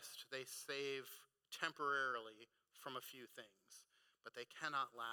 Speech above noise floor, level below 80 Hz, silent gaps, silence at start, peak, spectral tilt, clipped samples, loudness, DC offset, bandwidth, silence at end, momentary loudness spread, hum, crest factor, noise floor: 23 dB; under -90 dBFS; none; 0 s; -26 dBFS; -1.5 dB/octave; under 0.1%; -46 LUFS; under 0.1%; 19 kHz; 0 s; 21 LU; none; 22 dB; -70 dBFS